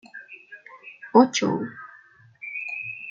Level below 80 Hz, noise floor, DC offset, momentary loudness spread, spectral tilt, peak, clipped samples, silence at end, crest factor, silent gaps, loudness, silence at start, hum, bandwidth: -76 dBFS; -53 dBFS; under 0.1%; 25 LU; -4.5 dB/octave; -4 dBFS; under 0.1%; 0 s; 22 dB; none; -23 LUFS; 0.15 s; none; 7.6 kHz